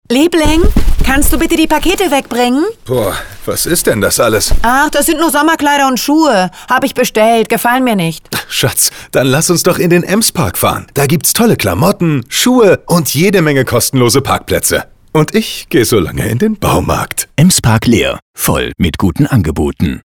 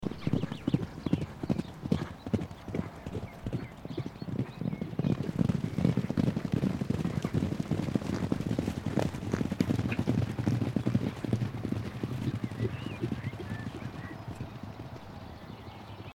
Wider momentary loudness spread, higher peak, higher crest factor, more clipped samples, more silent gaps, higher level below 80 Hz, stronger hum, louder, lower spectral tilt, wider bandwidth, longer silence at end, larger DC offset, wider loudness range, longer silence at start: second, 6 LU vs 11 LU; first, 0 dBFS vs -12 dBFS; second, 10 dB vs 20 dB; neither; first, 18.22-18.34 s vs none; first, -22 dBFS vs -52 dBFS; neither; first, -11 LUFS vs -33 LUFS; second, -4.5 dB/octave vs -7.5 dB/octave; first, over 20 kHz vs 16 kHz; about the same, 0.05 s vs 0 s; neither; second, 2 LU vs 6 LU; about the same, 0.1 s vs 0 s